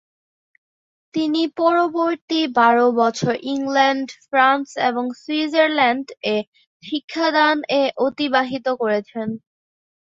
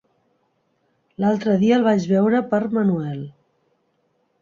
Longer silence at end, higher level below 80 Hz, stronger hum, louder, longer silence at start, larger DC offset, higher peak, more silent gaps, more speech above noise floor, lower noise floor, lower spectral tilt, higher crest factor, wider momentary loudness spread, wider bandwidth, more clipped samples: second, 0.8 s vs 1.1 s; about the same, -68 dBFS vs -64 dBFS; neither; about the same, -19 LUFS vs -19 LUFS; about the same, 1.15 s vs 1.2 s; neither; about the same, -4 dBFS vs -6 dBFS; first, 2.21-2.28 s, 6.47-6.53 s, 6.67-6.80 s, 7.04-7.08 s vs none; first, over 71 dB vs 49 dB; first, under -90 dBFS vs -67 dBFS; second, -4.5 dB/octave vs -8 dB/octave; about the same, 16 dB vs 16 dB; about the same, 10 LU vs 12 LU; about the same, 7.8 kHz vs 7.2 kHz; neither